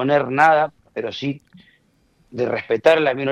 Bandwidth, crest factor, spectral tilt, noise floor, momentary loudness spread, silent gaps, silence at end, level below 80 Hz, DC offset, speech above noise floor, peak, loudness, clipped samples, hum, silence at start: 11 kHz; 18 dB; -6 dB/octave; -60 dBFS; 14 LU; none; 0 s; -62 dBFS; under 0.1%; 42 dB; -2 dBFS; -19 LUFS; under 0.1%; none; 0 s